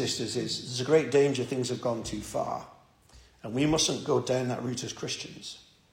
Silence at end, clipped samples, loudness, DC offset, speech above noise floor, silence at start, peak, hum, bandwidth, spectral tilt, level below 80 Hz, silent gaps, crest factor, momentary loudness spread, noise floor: 0.3 s; under 0.1%; -29 LUFS; under 0.1%; 28 dB; 0 s; -10 dBFS; none; 16.5 kHz; -4 dB/octave; -58 dBFS; none; 18 dB; 14 LU; -57 dBFS